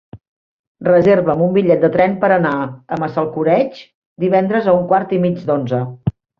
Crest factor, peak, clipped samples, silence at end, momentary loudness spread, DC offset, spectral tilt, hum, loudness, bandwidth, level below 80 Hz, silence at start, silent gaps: 14 dB; -2 dBFS; under 0.1%; 0.3 s; 10 LU; under 0.1%; -9.5 dB/octave; none; -16 LUFS; 6.4 kHz; -50 dBFS; 0.15 s; 0.28-0.75 s, 3.94-4.16 s